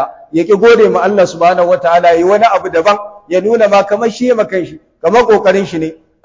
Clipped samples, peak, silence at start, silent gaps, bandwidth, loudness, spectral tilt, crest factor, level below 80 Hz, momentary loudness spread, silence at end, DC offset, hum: under 0.1%; 0 dBFS; 0 s; none; 7.6 kHz; -10 LUFS; -5.5 dB/octave; 10 dB; -50 dBFS; 9 LU; 0.3 s; under 0.1%; none